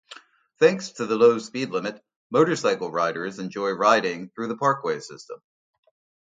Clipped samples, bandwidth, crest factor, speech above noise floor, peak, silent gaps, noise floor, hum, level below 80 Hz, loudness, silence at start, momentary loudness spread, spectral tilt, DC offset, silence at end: under 0.1%; 9.2 kHz; 22 dB; 25 dB; -4 dBFS; 2.16-2.30 s; -48 dBFS; none; -72 dBFS; -23 LUFS; 0.1 s; 13 LU; -5 dB/octave; under 0.1%; 0.95 s